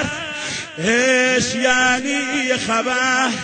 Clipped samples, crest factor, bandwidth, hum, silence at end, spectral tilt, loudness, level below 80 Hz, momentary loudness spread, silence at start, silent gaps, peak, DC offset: under 0.1%; 16 dB; 9.2 kHz; none; 0 s; -2.5 dB/octave; -17 LUFS; -52 dBFS; 10 LU; 0 s; none; -2 dBFS; under 0.1%